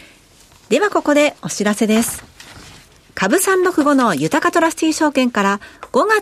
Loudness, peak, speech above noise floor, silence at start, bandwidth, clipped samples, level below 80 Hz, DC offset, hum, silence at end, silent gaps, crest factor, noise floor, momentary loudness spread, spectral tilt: -16 LUFS; -2 dBFS; 32 dB; 0.7 s; 15.5 kHz; under 0.1%; -52 dBFS; under 0.1%; none; 0 s; none; 14 dB; -48 dBFS; 7 LU; -4 dB/octave